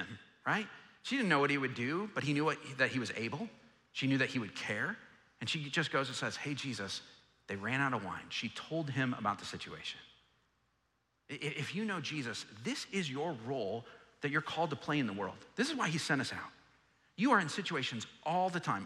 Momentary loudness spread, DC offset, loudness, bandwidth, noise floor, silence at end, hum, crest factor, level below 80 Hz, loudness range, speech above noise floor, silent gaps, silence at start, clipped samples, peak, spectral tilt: 11 LU; under 0.1%; -36 LUFS; 13 kHz; -79 dBFS; 0 s; none; 22 dB; -78 dBFS; 6 LU; 43 dB; none; 0 s; under 0.1%; -16 dBFS; -4.5 dB/octave